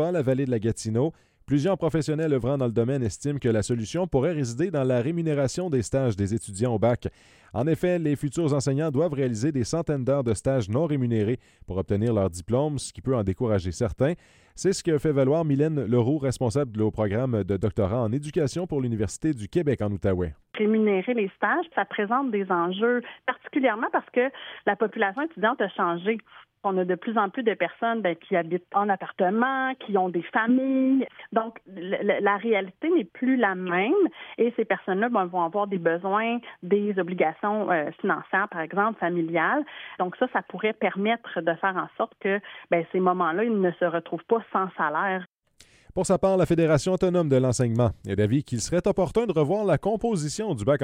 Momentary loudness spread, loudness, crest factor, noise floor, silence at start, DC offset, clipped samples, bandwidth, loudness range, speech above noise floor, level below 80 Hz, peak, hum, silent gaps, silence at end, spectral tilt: 6 LU; -25 LUFS; 16 dB; -58 dBFS; 0 s; under 0.1%; under 0.1%; 15.5 kHz; 2 LU; 33 dB; -52 dBFS; -8 dBFS; none; 45.28-45.32 s; 0 s; -6.5 dB/octave